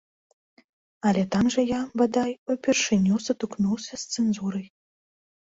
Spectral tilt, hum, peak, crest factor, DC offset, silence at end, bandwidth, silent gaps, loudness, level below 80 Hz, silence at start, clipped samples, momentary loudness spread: -5 dB/octave; none; -8 dBFS; 16 dB; under 0.1%; 0.75 s; 8 kHz; 2.38-2.46 s; -25 LUFS; -58 dBFS; 1.05 s; under 0.1%; 8 LU